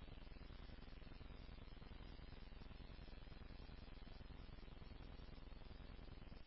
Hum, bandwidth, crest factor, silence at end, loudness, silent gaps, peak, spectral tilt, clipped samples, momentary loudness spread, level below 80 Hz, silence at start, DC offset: none; 5.6 kHz; 10 dB; 0 s; -60 LUFS; none; -46 dBFS; -5 dB/octave; under 0.1%; 1 LU; -58 dBFS; 0 s; under 0.1%